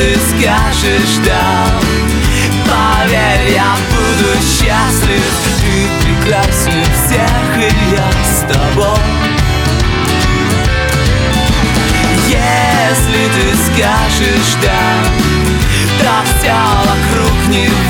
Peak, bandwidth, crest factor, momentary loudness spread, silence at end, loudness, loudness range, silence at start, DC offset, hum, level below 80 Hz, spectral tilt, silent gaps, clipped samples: 0 dBFS; 19.5 kHz; 10 dB; 2 LU; 0 s; -10 LUFS; 1 LU; 0 s; under 0.1%; none; -18 dBFS; -4 dB/octave; none; under 0.1%